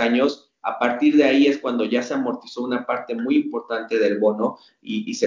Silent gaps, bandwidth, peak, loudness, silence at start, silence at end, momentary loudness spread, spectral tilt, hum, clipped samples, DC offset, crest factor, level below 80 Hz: none; 7.6 kHz; -4 dBFS; -21 LUFS; 0 s; 0 s; 12 LU; -5 dB/octave; none; under 0.1%; under 0.1%; 16 dB; -74 dBFS